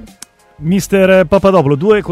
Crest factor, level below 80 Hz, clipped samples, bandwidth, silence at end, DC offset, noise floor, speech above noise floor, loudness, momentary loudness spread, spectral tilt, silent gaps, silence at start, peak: 12 dB; -38 dBFS; under 0.1%; 16 kHz; 0 s; under 0.1%; -39 dBFS; 29 dB; -11 LUFS; 7 LU; -6.5 dB/octave; none; 0.05 s; 0 dBFS